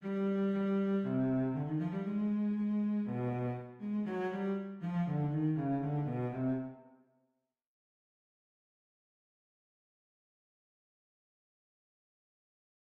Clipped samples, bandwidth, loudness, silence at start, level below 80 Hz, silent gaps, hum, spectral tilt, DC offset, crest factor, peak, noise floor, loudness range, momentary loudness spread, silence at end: under 0.1%; 4.4 kHz; -35 LUFS; 0 s; -70 dBFS; none; none; -10.5 dB/octave; under 0.1%; 14 dB; -24 dBFS; -83 dBFS; 8 LU; 5 LU; 6.1 s